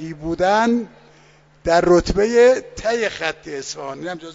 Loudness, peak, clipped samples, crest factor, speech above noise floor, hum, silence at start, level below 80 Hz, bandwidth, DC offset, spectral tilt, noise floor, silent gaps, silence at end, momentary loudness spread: -18 LUFS; -2 dBFS; under 0.1%; 18 dB; 33 dB; none; 0 s; -40 dBFS; 7.8 kHz; under 0.1%; -5 dB/octave; -51 dBFS; none; 0 s; 15 LU